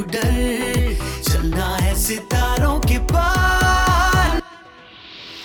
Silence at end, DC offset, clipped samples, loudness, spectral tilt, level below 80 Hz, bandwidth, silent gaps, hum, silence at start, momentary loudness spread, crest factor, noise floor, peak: 0 s; under 0.1%; under 0.1%; -18 LUFS; -4.5 dB/octave; -22 dBFS; over 20 kHz; none; none; 0 s; 7 LU; 12 dB; -42 dBFS; -6 dBFS